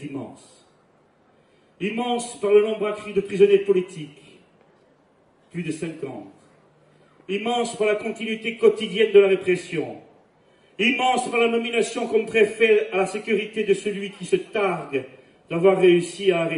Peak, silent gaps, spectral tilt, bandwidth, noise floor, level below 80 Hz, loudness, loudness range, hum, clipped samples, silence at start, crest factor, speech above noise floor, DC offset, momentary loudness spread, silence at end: -4 dBFS; none; -5 dB/octave; 11.5 kHz; -59 dBFS; -68 dBFS; -22 LUFS; 8 LU; none; under 0.1%; 0 s; 18 dB; 38 dB; under 0.1%; 14 LU; 0 s